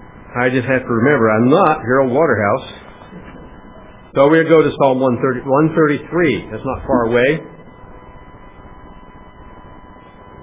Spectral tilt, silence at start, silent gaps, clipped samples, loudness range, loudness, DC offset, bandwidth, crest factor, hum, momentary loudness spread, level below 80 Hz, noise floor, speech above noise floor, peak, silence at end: -11 dB/octave; 0 s; none; under 0.1%; 7 LU; -15 LUFS; under 0.1%; 4 kHz; 16 dB; none; 12 LU; -44 dBFS; -39 dBFS; 26 dB; 0 dBFS; 0.6 s